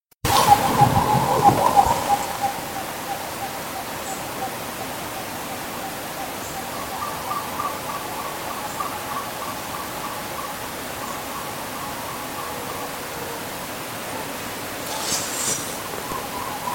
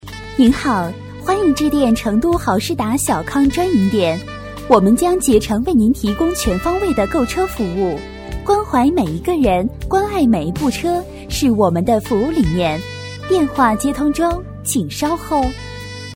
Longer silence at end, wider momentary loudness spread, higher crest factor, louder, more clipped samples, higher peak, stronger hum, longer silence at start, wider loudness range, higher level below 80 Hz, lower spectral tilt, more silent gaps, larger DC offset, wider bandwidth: about the same, 0 s vs 0 s; first, 12 LU vs 9 LU; first, 24 dB vs 16 dB; second, -24 LUFS vs -16 LUFS; neither; about the same, 0 dBFS vs 0 dBFS; neither; first, 0.25 s vs 0.05 s; first, 9 LU vs 2 LU; second, -48 dBFS vs -32 dBFS; second, -3.5 dB/octave vs -5.5 dB/octave; neither; neither; about the same, 17 kHz vs 16.5 kHz